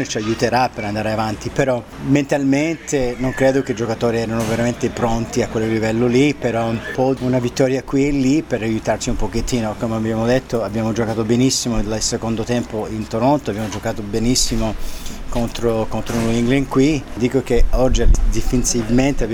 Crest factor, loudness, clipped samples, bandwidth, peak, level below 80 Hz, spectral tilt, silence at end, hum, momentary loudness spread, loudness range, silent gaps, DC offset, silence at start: 16 dB; -19 LUFS; under 0.1%; 17.5 kHz; -2 dBFS; -26 dBFS; -5 dB/octave; 0 s; none; 6 LU; 2 LU; none; under 0.1%; 0 s